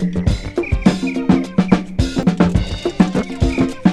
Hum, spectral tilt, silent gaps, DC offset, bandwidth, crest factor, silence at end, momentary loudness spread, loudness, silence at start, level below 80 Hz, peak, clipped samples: none; -7 dB/octave; none; under 0.1%; 11 kHz; 16 dB; 0 s; 4 LU; -17 LUFS; 0 s; -26 dBFS; 0 dBFS; under 0.1%